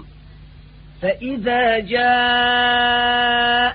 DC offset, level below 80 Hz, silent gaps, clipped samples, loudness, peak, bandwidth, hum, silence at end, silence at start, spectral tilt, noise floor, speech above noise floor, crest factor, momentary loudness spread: under 0.1%; -44 dBFS; none; under 0.1%; -17 LUFS; -4 dBFS; 4.9 kHz; none; 0 s; 0 s; -8.5 dB/octave; -42 dBFS; 25 dB; 14 dB; 8 LU